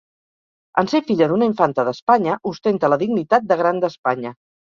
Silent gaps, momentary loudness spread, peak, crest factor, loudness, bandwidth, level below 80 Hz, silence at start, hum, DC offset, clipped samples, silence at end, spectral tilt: 2.02-2.07 s, 3.98-4.04 s; 6 LU; -2 dBFS; 18 dB; -19 LUFS; 7.2 kHz; -62 dBFS; 0.75 s; none; under 0.1%; under 0.1%; 0.45 s; -7 dB/octave